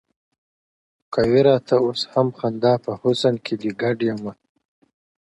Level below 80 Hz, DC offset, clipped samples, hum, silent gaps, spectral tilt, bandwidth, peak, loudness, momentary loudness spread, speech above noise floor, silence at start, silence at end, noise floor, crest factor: -56 dBFS; under 0.1%; under 0.1%; none; none; -6.5 dB/octave; 11 kHz; -4 dBFS; -20 LUFS; 10 LU; over 70 dB; 1.1 s; 0.9 s; under -90 dBFS; 18 dB